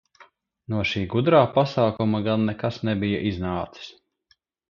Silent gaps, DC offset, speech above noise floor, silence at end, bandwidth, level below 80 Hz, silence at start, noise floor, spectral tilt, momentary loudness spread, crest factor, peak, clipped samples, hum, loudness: none; under 0.1%; 43 dB; 0.8 s; 7 kHz; -48 dBFS; 0.2 s; -66 dBFS; -7.5 dB/octave; 12 LU; 20 dB; -4 dBFS; under 0.1%; none; -23 LUFS